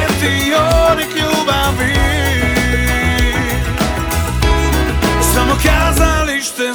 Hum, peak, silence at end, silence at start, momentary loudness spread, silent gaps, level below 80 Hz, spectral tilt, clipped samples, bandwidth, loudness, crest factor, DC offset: none; 0 dBFS; 0 s; 0 s; 5 LU; none; -18 dBFS; -4.5 dB/octave; under 0.1%; over 20 kHz; -14 LUFS; 14 dB; under 0.1%